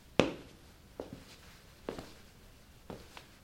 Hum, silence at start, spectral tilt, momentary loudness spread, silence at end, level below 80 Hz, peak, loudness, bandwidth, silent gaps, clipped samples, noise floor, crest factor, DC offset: none; 0 s; -5 dB/octave; 23 LU; 0 s; -60 dBFS; -4 dBFS; -41 LUFS; 16.5 kHz; none; under 0.1%; -57 dBFS; 38 dB; under 0.1%